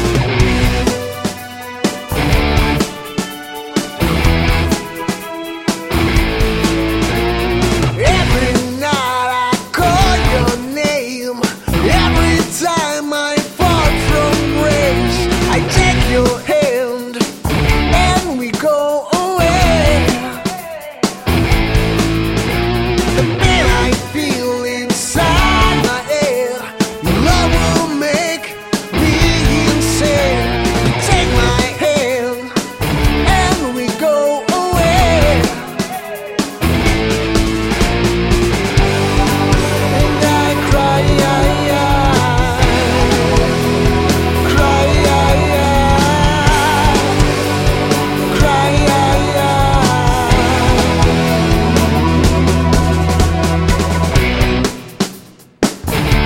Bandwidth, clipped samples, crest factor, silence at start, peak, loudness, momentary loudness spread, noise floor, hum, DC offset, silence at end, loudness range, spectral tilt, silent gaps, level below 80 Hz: 16.5 kHz; under 0.1%; 14 dB; 0 s; 0 dBFS; -14 LUFS; 7 LU; -38 dBFS; none; under 0.1%; 0 s; 3 LU; -5 dB/octave; none; -20 dBFS